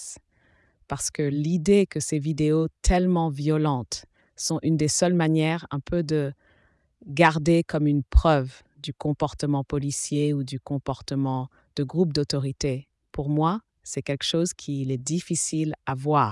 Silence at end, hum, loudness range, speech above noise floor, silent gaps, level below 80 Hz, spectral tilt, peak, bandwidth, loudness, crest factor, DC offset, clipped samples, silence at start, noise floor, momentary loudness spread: 0 s; none; 4 LU; 39 dB; none; -36 dBFS; -5.5 dB/octave; -6 dBFS; 12 kHz; -25 LUFS; 18 dB; under 0.1%; under 0.1%; 0 s; -63 dBFS; 12 LU